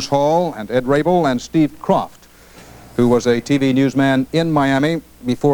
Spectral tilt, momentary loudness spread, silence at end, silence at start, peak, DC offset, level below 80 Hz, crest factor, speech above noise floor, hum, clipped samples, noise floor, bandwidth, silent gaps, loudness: -6.5 dB/octave; 6 LU; 0 s; 0 s; 0 dBFS; under 0.1%; -46 dBFS; 16 dB; 27 dB; none; under 0.1%; -43 dBFS; 20 kHz; none; -17 LUFS